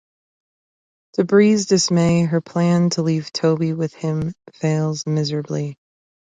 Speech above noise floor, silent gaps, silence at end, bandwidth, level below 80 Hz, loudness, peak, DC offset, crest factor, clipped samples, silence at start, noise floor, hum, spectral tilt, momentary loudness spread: over 72 dB; none; 0.6 s; 9.4 kHz; -56 dBFS; -19 LUFS; -2 dBFS; under 0.1%; 16 dB; under 0.1%; 1.2 s; under -90 dBFS; none; -6 dB/octave; 11 LU